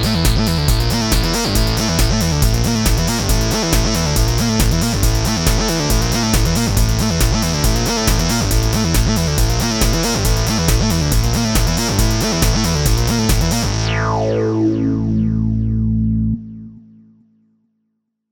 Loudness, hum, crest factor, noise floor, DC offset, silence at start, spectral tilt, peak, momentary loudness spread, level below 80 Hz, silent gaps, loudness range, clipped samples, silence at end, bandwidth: -16 LUFS; none; 16 dB; -71 dBFS; under 0.1%; 0 s; -4.5 dB/octave; 0 dBFS; 2 LU; -20 dBFS; none; 2 LU; under 0.1%; 1.55 s; 19.5 kHz